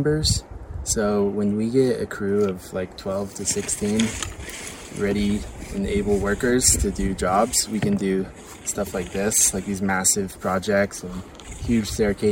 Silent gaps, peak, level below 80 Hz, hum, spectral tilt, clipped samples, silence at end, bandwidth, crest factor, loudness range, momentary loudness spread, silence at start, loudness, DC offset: none; -4 dBFS; -38 dBFS; none; -4 dB/octave; under 0.1%; 0 s; 16.5 kHz; 18 dB; 4 LU; 14 LU; 0 s; -22 LUFS; under 0.1%